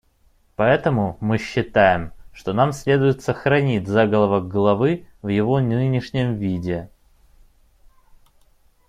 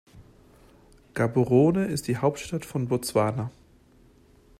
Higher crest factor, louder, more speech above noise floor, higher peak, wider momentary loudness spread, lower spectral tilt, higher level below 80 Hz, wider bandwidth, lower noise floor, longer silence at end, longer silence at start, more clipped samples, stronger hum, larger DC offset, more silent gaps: about the same, 18 dB vs 18 dB; first, -20 LUFS vs -25 LUFS; first, 39 dB vs 33 dB; first, -2 dBFS vs -8 dBFS; second, 9 LU vs 13 LU; about the same, -7.5 dB/octave vs -6.5 dB/octave; first, -48 dBFS vs -56 dBFS; second, 12 kHz vs 15.5 kHz; about the same, -59 dBFS vs -57 dBFS; first, 2 s vs 1.1 s; first, 0.6 s vs 0.15 s; neither; neither; neither; neither